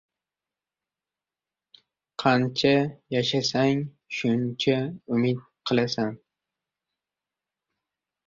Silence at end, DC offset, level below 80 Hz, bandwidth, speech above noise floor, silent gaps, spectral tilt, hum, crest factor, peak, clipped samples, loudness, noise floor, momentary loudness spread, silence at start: 2.1 s; under 0.1%; -66 dBFS; 7.6 kHz; over 66 dB; none; -5.5 dB/octave; none; 20 dB; -6 dBFS; under 0.1%; -25 LUFS; under -90 dBFS; 7 LU; 2.2 s